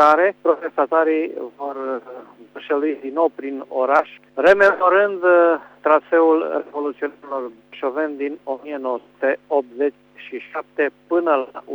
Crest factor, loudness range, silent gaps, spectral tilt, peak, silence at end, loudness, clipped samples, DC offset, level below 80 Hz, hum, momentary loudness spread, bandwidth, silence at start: 16 dB; 8 LU; none; -5.5 dB/octave; -4 dBFS; 0 s; -19 LUFS; under 0.1%; under 0.1%; -66 dBFS; 50 Hz at -65 dBFS; 15 LU; 7.6 kHz; 0 s